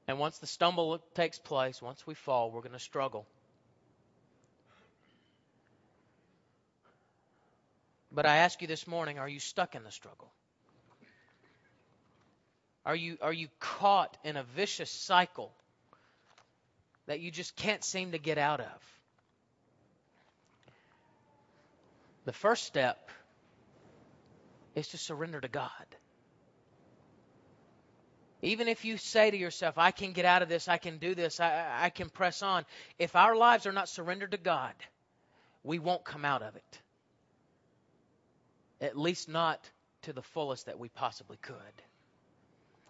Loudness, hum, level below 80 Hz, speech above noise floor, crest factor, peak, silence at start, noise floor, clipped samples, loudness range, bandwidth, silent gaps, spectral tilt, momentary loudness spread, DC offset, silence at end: -32 LUFS; none; -76 dBFS; 42 dB; 28 dB; -8 dBFS; 0.1 s; -74 dBFS; under 0.1%; 14 LU; 7.6 kHz; none; -2 dB/octave; 19 LU; under 0.1%; 1.2 s